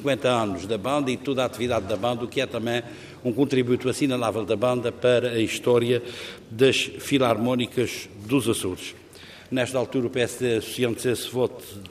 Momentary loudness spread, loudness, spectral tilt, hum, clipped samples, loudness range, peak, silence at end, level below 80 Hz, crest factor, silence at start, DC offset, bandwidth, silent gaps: 10 LU; -24 LUFS; -5 dB/octave; none; under 0.1%; 4 LU; -6 dBFS; 0 s; -62 dBFS; 18 dB; 0 s; under 0.1%; 15.5 kHz; none